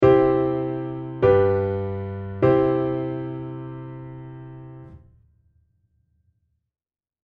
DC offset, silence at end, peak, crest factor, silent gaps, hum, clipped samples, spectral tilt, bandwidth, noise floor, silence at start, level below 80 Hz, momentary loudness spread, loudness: under 0.1%; 2.25 s; -2 dBFS; 22 dB; none; none; under 0.1%; -10.5 dB/octave; 4.8 kHz; under -90 dBFS; 0 s; -48 dBFS; 22 LU; -22 LUFS